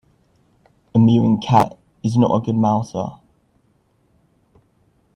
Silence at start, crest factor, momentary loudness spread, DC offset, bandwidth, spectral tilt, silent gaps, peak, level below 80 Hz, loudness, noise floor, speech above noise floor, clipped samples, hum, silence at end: 0.95 s; 20 dB; 12 LU; under 0.1%; 10 kHz; -8 dB/octave; none; 0 dBFS; -54 dBFS; -18 LUFS; -61 dBFS; 45 dB; under 0.1%; none; 2.05 s